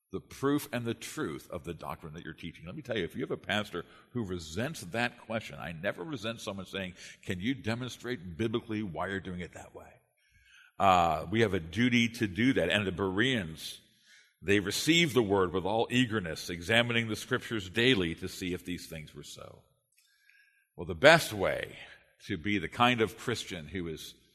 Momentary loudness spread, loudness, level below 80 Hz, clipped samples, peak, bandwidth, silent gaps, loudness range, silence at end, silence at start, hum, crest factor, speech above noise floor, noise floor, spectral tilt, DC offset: 17 LU; -31 LUFS; -60 dBFS; under 0.1%; -4 dBFS; 13.5 kHz; none; 8 LU; 0.2 s; 0.15 s; none; 28 dB; 39 dB; -70 dBFS; -4.5 dB/octave; under 0.1%